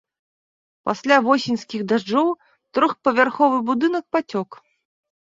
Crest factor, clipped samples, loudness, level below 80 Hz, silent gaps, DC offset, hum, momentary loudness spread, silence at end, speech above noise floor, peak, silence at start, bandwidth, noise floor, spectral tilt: 20 dB; under 0.1%; -20 LUFS; -68 dBFS; none; under 0.1%; none; 11 LU; 0.7 s; over 70 dB; -2 dBFS; 0.85 s; 7.8 kHz; under -90 dBFS; -5 dB/octave